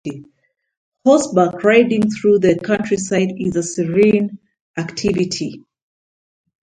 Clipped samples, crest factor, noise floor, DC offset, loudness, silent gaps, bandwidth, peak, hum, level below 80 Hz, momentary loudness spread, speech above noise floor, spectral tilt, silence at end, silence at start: under 0.1%; 18 dB; under -90 dBFS; under 0.1%; -16 LUFS; 0.77-0.92 s, 4.61-4.74 s; 9.6 kHz; 0 dBFS; none; -52 dBFS; 13 LU; over 74 dB; -5.5 dB/octave; 1.05 s; 0.05 s